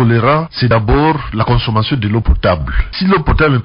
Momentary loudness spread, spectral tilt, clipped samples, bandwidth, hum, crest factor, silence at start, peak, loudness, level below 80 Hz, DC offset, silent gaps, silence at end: 5 LU; -5.5 dB/octave; under 0.1%; 5.4 kHz; none; 10 dB; 0 s; -2 dBFS; -13 LUFS; -20 dBFS; under 0.1%; none; 0 s